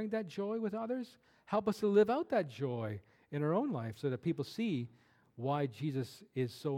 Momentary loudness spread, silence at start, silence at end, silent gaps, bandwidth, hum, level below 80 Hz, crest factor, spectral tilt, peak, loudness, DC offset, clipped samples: 11 LU; 0 s; 0 s; none; 15.5 kHz; none; -78 dBFS; 18 dB; -7.5 dB/octave; -18 dBFS; -36 LUFS; under 0.1%; under 0.1%